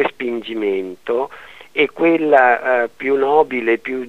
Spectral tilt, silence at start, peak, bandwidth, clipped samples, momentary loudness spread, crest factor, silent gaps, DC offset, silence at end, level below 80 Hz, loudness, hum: -6 dB/octave; 0 s; 0 dBFS; 8.4 kHz; under 0.1%; 11 LU; 18 dB; none; 0.4%; 0 s; -62 dBFS; -17 LUFS; none